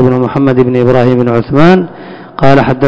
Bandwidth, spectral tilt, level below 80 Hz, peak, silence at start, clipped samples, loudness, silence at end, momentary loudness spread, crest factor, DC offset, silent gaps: 8 kHz; -9 dB/octave; -34 dBFS; 0 dBFS; 0 s; 7%; -8 LUFS; 0 s; 11 LU; 8 dB; under 0.1%; none